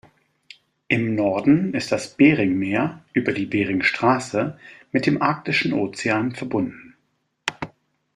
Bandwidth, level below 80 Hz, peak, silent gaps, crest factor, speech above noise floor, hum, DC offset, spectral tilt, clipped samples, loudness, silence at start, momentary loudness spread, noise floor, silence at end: 11 kHz; -58 dBFS; -2 dBFS; none; 20 dB; 49 dB; none; under 0.1%; -6 dB/octave; under 0.1%; -21 LUFS; 0.9 s; 12 LU; -70 dBFS; 0.5 s